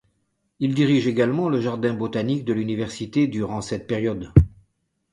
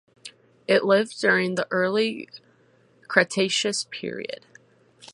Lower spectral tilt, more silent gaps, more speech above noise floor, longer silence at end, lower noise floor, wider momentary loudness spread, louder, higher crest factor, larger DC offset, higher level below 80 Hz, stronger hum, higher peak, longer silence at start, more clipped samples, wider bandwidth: first, -7.5 dB/octave vs -3.5 dB/octave; neither; first, 50 dB vs 36 dB; first, 0.65 s vs 0.05 s; first, -71 dBFS vs -60 dBFS; second, 9 LU vs 20 LU; about the same, -23 LUFS vs -23 LUFS; about the same, 22 dB vs 24 dB; neither; first, -36 dBFS vs -74 dBFS; neither; about the same, 0 dBFS vs -2 dBFS; first, 0.6 s vs 0.25 s; neither; about the same, 11 kHz vs 11.5 kHz